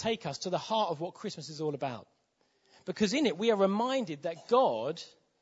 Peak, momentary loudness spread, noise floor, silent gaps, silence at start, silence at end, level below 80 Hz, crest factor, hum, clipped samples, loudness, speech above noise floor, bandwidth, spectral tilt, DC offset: -14 dBFS; 14 LU; -73 dBFS; none; 0 s; 0.35 s; -72 dBFS; 18 dB; none; under 0.1%; -31 LUFS; 42 dB; 8 kHz; -5 dB/octave; under 0.1%